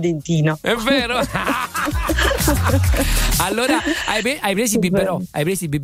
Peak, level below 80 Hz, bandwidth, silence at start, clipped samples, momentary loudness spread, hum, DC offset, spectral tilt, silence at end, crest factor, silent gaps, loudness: -4 dBFS; -26 dBFS; 16.5 kHz; 0 s; under 0.1%; 4 LU; none; under 0.1%; -4.5 dB/octave; 0 s; 14 dB; none; -18 LUFS